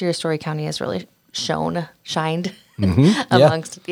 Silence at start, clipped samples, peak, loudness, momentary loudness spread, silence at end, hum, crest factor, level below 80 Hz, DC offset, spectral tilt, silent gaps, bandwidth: 0 s; under 0.1%; -2 dBFS; -20 LUFS; 13 LU; 0 s; none; 18 dB; -54 dBFS; under 0.1%; -6 dB/octave; none; 16 kHz